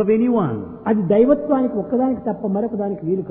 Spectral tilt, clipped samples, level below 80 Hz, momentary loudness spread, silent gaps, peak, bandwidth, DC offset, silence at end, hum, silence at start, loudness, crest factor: -13 dB/octave; under 0.1%; -52 dBFS; 8 LU; none; -4 dBFS; 3.7 kHz; under 0.1%; 0 s; none; 0 s; -19 LUFS; 16 dB